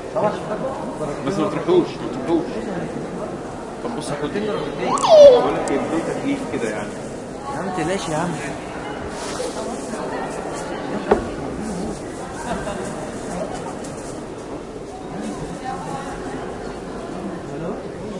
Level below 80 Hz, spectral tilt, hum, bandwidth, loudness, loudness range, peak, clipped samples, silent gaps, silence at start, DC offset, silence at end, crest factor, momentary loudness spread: -44 dBFS; -5.5 dB/octave; none; 11.5 kHz; -22 LUFS; 13 LU; 0 dBFS; under 0.1%; none; 0 s; under 0.1%; 0 s; 22 dB; 12 LU